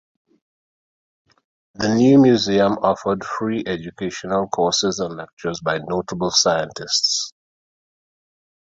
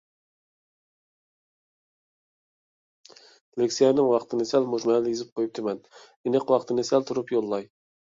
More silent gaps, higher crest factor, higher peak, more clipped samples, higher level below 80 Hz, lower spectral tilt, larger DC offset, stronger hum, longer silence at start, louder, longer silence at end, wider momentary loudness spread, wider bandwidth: second, 5.33-5.37 s vs 5.32-5.36 s, 6.16-6.24 s; about the same, 18 dB vs 20 dB; first, -2 dBFS vs -8 dBFS; neither; first, -54 dBFS vs -72 dBFS; about the same, -4 dB/octave vs -5 dB/octave; neither; neither; second, 1.8 s vs 3.55 s; first, -19 LUFS vs -25 LUFS; first, 1.4 s vs 0.5 s; first, 14 LU vs 11 LU; about the same, 7.8 kHz vs 7.8 kHz